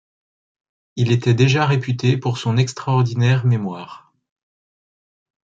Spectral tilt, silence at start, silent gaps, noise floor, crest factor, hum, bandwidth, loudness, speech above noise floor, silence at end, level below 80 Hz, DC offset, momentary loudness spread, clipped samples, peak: -6.5 dB/octave; 0.95 s; none; under -90 dBFS; 16 dB; none; 7.8 kHz; -18 LUFS; over 73 dB; 1.55 s; -58 dBFS; under 0.1%; 12 LU; under 0.1%; -2 dBFS